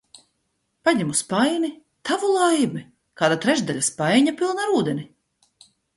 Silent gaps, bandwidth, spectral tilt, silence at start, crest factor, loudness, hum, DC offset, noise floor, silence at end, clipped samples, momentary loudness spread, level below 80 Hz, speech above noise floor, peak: none; 11.5 kHz; -4 dB/octave; 0.85 s; 18 dB; -21 LUFS; none; under 0.1%; -73 dBFS; 0.9 s; under 0.1%; 8 LU; -66 dBFS; 52 dB; -6 dBFS